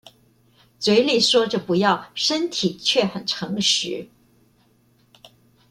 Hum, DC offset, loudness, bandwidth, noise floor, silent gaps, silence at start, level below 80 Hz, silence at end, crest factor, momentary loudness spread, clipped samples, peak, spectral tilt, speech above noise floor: none; under 0.1%; -20 LUFS; 15.5 kHz; -60 dBFS; none; 0.8 s; -66 dBFS; 1.65 s; 18 dB; 9 LU; under 0.1%; -4 dBFS; -3.5 dB/octave; 39 dB